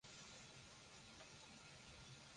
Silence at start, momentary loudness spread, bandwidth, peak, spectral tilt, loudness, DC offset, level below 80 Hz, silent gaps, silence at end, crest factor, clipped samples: 0.05 s; 2 LU; 11 kHz; -48 dBFS; -2.5 dB/octave; -60 LUFS; under 0.1%; -76 dBFS; none; 0 s; 14 dB; under 0.1%